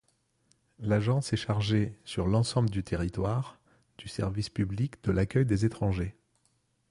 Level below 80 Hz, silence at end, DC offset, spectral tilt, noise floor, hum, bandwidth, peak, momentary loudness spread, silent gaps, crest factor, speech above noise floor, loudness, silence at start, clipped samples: -46 dBFS; 0.8 s; under 0.1%; -6.5 dB/octave; -72 dBFS; none; 11.5 kHz; -14 dBFS; 8 LU; none; 16 dB; 44 dB; -30 LUFS; 0.8 s; under 0.1%